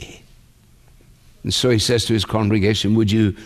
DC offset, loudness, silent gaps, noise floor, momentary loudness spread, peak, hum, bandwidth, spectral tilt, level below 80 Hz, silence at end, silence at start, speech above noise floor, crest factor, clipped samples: under 0.1%; -18 LUFS; none; -50 dBFS; 6 LU; -4 dBFS; none; 14 kHz; -5 dB/octave; -44 dBFS; 0 s; 0 s; 33 dB; 16 dB; under 0.1%